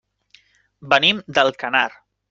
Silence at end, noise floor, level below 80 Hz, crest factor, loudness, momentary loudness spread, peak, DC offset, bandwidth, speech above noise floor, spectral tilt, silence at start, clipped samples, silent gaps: 0.4 s; -56 dBFS; -62 dBFS; 22 dB; -18 LUFS; 5 LU; 0 dBFS; under 0.1%; 7.6 kHz; 37 dB; -3.5 dB/octave; 0.85 s; under 0.1%; none